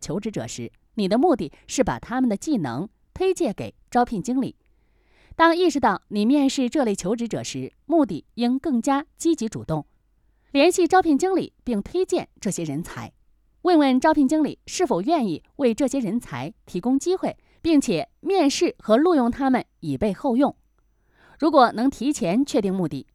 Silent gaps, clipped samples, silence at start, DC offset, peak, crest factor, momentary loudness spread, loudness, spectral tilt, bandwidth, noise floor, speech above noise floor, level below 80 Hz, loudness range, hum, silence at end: none; under 0.1%; 0 s; under 0.1%; -4 dBFS; 18 dB; 12 LU; -22 LUFS; -5 dB/octave; 14 kHz; -63 dBFS; 42 dB; -52 dBFS; 3 LU; none; 0.1 s